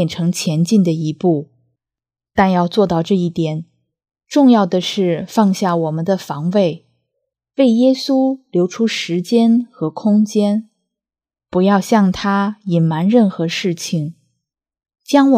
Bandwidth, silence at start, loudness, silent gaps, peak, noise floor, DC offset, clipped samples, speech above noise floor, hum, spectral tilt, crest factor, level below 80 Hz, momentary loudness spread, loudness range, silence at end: 15 kHz; 0 s; -16 LUFS; none; 0 dBFS; under -90 dBFS; under 0.1%; under 0.1%; over 75 dB; none; -6.5 dB/octave; 16 dB; -54 dBFS; 8 LU; 2 LU; 0 s